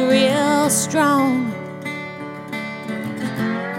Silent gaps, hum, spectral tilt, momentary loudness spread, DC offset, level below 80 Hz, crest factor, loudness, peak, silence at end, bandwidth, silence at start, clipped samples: none; none; -4 dB/octave; 13 LU; under 0.1%; -62 dBFS; 16 dB; -20 LUFS; -4 dBFS; 0 s; 17 kHz; 0 s; under 0.1%